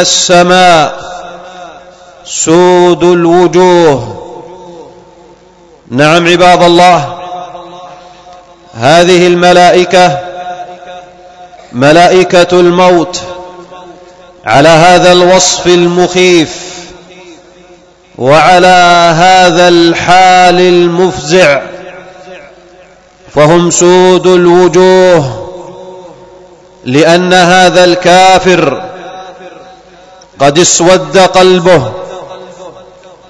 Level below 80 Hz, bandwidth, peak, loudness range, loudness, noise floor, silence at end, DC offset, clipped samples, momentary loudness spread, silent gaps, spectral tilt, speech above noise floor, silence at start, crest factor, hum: -40 dBFS; 11 kHz; 0 dBFS; 3 LU; -5 LUFS; -39 dBFS; 0.6 s; under 0.1%; 9%; 20 LU; none; -4 dB/octave; 34 dB; 0 s; 6 dB; none